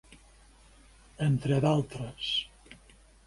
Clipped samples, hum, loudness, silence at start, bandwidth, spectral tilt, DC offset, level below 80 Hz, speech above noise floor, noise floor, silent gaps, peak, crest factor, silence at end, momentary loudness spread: under 0.1%; none; -29 LUFS; 0.1 s; 11.5 kHz; -6.5 dB/octave; under 0.1%; -56 dBFS; 29 dB; -58 dBFS; none; -14 dBFS; 20 dB; 0.5 s; 11 LU